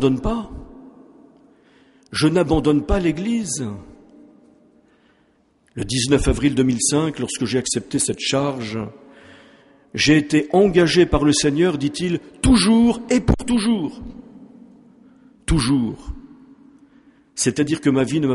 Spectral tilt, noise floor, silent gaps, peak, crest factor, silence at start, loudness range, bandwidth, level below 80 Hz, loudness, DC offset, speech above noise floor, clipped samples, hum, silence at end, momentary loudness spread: -4.5 dB/octave; -60 dBFS; none; -2 dBFS; 18 dB; 0 s; 8 LU; 11.5 kHz; -34 dBFS; -19 LUFS; under 0.1%; 42 dB; under 0.1%; none; 0 s; 16 LU